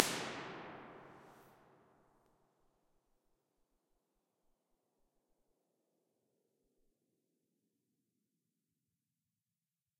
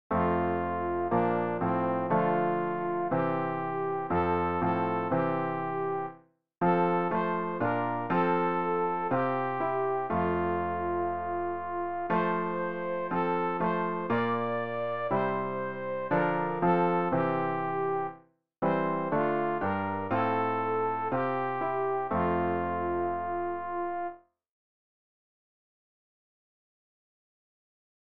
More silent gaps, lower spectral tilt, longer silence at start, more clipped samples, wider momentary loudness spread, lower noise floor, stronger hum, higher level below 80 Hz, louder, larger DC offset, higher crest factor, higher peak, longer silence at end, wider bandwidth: neither; second, -2 dB/octave vs -6.5 dB/octave; about the same, 0 s vs 0.1 s; neither; first, 23 LU vs 6 LU; first, under -90 dBFS vs -57 dBFS; neither; second, -84 dBFS vs -60 dBFS; second, -44 LUFS vs -30 LUFS; second, under 0.1% vs 0.3%; first, 48 dB vs 16 dB; first, -2 dBFS vs -14 dBFS; first, 8.45 s vs 3.5 s; first, 15.5 kHz vs 5 kHz